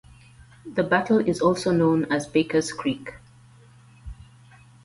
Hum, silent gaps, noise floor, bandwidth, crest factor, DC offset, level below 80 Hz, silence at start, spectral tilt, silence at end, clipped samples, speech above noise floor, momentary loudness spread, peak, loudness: none; none; -51 dBFS; 11.5 kHz; 18 dB; under 0.1%; -52 dBFS; 0.65 s; -6 dB/octave; 0.7 s; under 0.1%; 29 dB; 24 LU; -8 dBFS; -23 LUFS